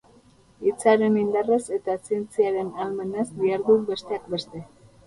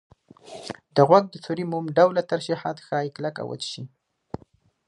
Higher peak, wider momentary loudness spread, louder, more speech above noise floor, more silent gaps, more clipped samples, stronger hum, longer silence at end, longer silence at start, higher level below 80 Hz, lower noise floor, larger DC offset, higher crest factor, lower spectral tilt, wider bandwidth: second, -6 dBFS vs -2 dBFS; second, 10 LU vs 23 LU; about the same, -24 LUFS vs -23 LUFS; second, 32 dB vs 36 dB; neither; neither; neither; second, 0.4 s vs 1 s; first, 0.6 s vs 0.45 s; about the same, -62 dBFS vs -64 dBFS; about the same, -55 dBFS vs -58 dBFS; neither; about the same, 20 dB vs 22 dB; about the same, -5.5 dB/octave vs -6 dB/octave; about the same, 11.5 kHz vs 11 kHz